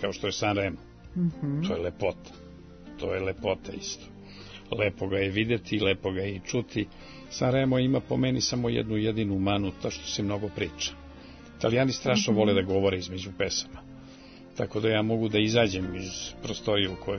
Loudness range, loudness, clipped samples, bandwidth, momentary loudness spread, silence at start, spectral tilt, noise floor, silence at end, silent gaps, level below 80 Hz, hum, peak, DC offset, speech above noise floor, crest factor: 5 LU; -28 LUFS; under 0.1%; 6.6 kHz; 21 LU; 0 s; -5 dB/octave; -48 dBFS; 0 s; none; -52 dBFS; none; -10 dBFS; under 0.1%; 20 dB; 18 dB